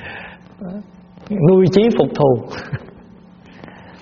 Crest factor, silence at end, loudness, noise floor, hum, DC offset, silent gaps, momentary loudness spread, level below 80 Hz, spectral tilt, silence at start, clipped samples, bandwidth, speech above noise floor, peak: 18 dB; 0.35 s; -15 LUFS; -43 dBFS; none; under 0.1%; none; 22 LU; -48 dBFS; -7 dB/octave; 0 s; under 0.1%; 6.8 kHz; 28 dB; 0 dBFS